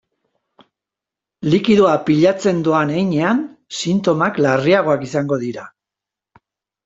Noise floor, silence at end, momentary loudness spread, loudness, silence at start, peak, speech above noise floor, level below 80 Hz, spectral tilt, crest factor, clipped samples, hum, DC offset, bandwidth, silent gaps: -86 dBFS; 1.15 s; 10 LU; -16 LUFS; 1.4 s; -2 dBFS; 70 dB; -58 dBFS; -6 dB/octave; 16 dB; under 0.1%; none; under 0.1%; 8 kHz; none